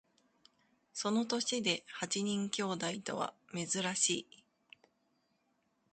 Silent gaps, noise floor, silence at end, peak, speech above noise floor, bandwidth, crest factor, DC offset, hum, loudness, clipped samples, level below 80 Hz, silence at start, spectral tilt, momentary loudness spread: none; -78 dBFS; 1.7 s; -18 dBFS; 42 dB; 9 kHz; 22 dB; under 0.1%; none; -35 LUFS; under 0.1%; -80 dBFS; 0.95 s; -2.5 dB/octave; 8 LU